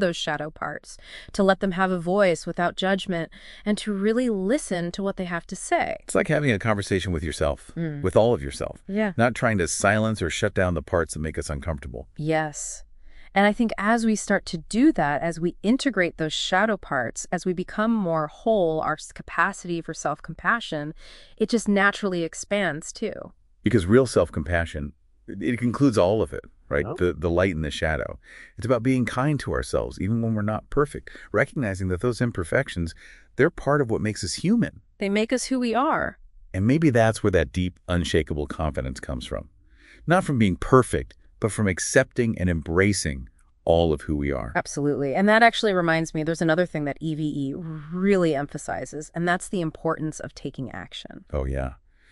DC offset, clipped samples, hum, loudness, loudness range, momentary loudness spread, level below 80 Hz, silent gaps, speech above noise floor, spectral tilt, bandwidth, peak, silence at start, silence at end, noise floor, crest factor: under 0.1%; under 0.1%; none; -24 LUFS; 4 LU; 12 LU; -42 dBFS; none; 28 dB; -5.5 dB/octave; 11.5 kHz; -2 dBFS; 0 s; 0.35 s; -52 dBFS; 22 dB